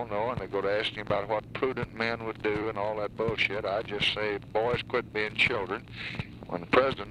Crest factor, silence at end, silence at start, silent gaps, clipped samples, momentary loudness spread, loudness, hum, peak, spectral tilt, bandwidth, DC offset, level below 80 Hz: 20 dB; 0 s; 0 s; none; under 0.1%; 10 LU; -30 LUFS; none; -10 dBFS; -5.5 dB/octave; 11.5 kHz; under 0.1%; -54 dBFS